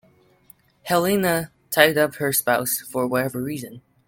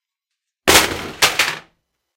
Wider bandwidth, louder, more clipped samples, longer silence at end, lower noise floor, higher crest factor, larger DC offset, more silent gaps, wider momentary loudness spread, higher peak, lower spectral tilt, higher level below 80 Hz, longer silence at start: about the same, 17 kHz vs 17 kHz; second, -21 LUFS vs -15 LUFS; neither; second, 0.3 s vs 0.55 s; second, -55 dBFS vs -81 dBFS; about the same, 22 dB vs 20 dB; neither; neither; first, 13 LU vs 9 LU; about the same, 0 dBFS vs 0 dBFS; first, -3.5 dB/octave vs -1 dB/octave; second, -60 dBFS vs -42 dBFS; first, 0.85 s vs 0.65 s